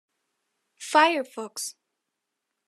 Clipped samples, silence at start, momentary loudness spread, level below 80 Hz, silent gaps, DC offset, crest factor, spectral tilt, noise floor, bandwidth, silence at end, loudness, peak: under 0.1%; 0.8 s; 15 LU; under -90 dBFS; none; under 0.1%; 22 dB; -0.5 dB/octave; -83 dBFS; 14 kHz; 0.95 s; -24 LUFS; -6 dBFS